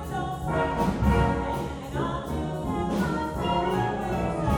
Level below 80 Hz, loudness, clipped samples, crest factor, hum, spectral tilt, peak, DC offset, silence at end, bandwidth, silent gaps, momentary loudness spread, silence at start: -36 dBFS; -27 LUFS; under 0.1%; 16 dB; none; -7 dB/octave; -10 dBFS; under 0.1%; 0 s; over 20 kHz; none; 7 LU; 0 s